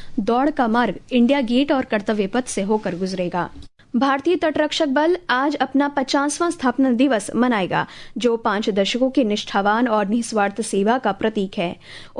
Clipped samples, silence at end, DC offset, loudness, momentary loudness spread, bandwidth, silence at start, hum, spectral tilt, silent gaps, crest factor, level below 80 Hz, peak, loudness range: under 0.1%; 0 s; under 0.1%; -20 LUFS; 6 LU; 11 kHz; 0 s; none; -4.5 dB/octave; none; 16 dB; -50 dBFS; -4 dBFS; 2 LU